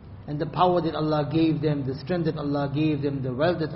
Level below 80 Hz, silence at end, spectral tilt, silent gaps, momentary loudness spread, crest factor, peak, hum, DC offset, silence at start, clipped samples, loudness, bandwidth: -50 dBFS; 0 s; -6.5 dB/octave; none; 7 LU; 18 dB; -6 dBFS; none; under 0.1%; 0 s; under 0.1%; -25 LUFS; 5.8 kHz